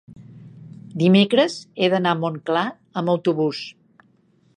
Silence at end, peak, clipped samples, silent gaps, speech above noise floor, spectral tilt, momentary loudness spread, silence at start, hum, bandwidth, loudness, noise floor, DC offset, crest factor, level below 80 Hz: 0.85 s; -2 dBFS; under 0.1%; none; 40 dB; -6.5 dB/octave; 16 LU; 0.1 s; none; 9.8 kHz; -20 LUFS; -60 dBFS; under 0.1%; 18 dB; -68 dBFS